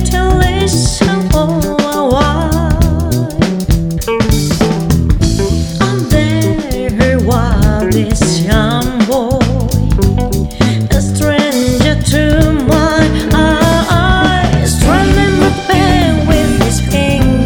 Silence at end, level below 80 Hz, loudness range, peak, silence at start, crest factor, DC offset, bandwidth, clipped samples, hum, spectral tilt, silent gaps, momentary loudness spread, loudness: 0 s; -18 dBFS; 3 LU; 0 dBFS; 0 s; 10 dB; under 0.1%; over 20 kHz; under 0.1%; none; -5.5 dB/octave; none; 4 LU; -11 LUFS